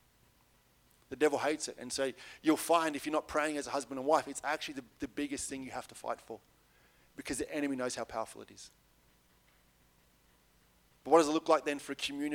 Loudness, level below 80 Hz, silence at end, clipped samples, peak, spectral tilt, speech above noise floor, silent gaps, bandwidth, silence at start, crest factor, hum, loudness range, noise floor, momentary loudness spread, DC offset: -34 LUFS; -68 dBFS; 0 s; under 0.1%; -12 dBFS; -3 dB/octave; 34 dB; none; 17.5 kHz; 1.1 s; 24 dB; none; 8 LU; -68 dBFS; 19 LU; under 0.1%